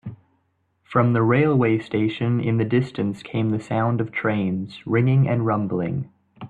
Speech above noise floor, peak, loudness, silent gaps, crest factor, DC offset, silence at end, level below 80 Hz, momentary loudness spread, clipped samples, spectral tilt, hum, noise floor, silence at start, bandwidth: 48 dB; -6 dBFS; -22 LUFS; none; 16 dB; under 0.1%; 0 s; -58 dBFS; 9 LU; under 0.1%; -9 dB/octave; none; -68 dBFS; 0.05 s; 8 kHz